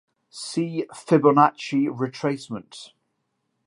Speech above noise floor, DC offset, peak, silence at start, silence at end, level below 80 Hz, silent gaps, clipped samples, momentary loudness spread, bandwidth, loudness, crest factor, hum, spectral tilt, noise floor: 53 dB; under 0.1%; -2 dBFS; 0.35 s; 0.8 s; -74 dBFS; none; under 0.1%; 20 LU; 11.5 kHz; -22 LUFS; 22 dB; none; -6 dB/octave; -75 dBFS